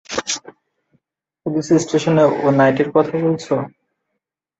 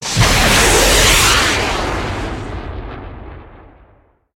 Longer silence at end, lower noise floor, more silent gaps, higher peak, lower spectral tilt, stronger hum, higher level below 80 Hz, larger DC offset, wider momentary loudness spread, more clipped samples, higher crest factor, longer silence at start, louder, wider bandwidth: about the same, 0.9 s vs 0.8 s; first, -78 dBFS vs -52 dBFS; neither; about the same, -2 dBFS vs 0 dBFS; first, -5.5 dB/octave vs -2.5 dB/octave; neither; second, -58 dBFS vs -24 dBFS; neither; second, 10 LU vs 20 LU; neither; about the same, 16 dB vs 16 dB; about the same, 0.1 s vs 0 s; second, -17 LUFS vs -12 LUFS; second, 8.2 kHz vs 17 kHz